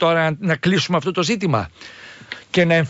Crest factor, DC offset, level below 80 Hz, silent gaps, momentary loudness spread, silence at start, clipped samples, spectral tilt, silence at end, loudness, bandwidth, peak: 14 dB; under 0.1%; -54 dBFS; none; 19 LU; 0 s; under 0.1%; -5.5 dB/octave; 0 s; -19 LUFS; 8 kHz; -4 dBFS